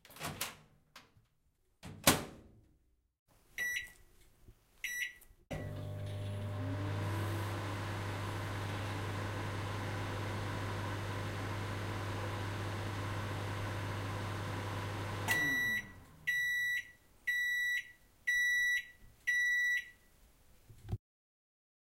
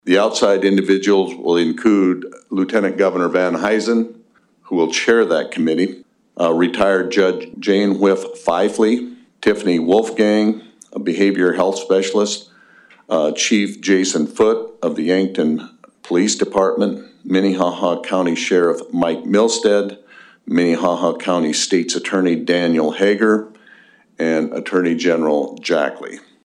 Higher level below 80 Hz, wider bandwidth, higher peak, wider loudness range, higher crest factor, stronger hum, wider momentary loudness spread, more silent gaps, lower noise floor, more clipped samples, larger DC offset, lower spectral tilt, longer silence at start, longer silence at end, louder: about the same, -58 dBFS vs -62 dBFS; first, 16 kHz vs 11.5 kHz; second, -10 dBFS vs -4 dBFS; first, 8 LU vs 2 LU; first, 30 dB vs 12 dB; neither; first, 13 LU vs 7 LU; first, 3.19-3.26 s vs none; first, -75 dBFS vs -50 dBFS; neither; neither; about the same, -3.5 dB/octave vs -4.5 dB/octave; about the same, 0.1 s vs 0.05 s; first, 1 s vs 0.25 s; second, -37 LUFS vs -17 LUFS